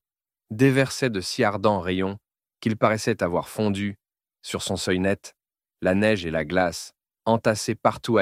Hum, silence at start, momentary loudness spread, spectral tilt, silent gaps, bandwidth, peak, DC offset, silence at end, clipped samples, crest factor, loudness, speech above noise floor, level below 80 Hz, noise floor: none; 0.5 s; 10 LU; -5.5 dB/octave; none; 16 kHz; -6 dBFS; under 0.1%; 0 s; under 0.1%; 20 dB; -24 LUFS; 62 dB; -56 dBFS; -85 dBFS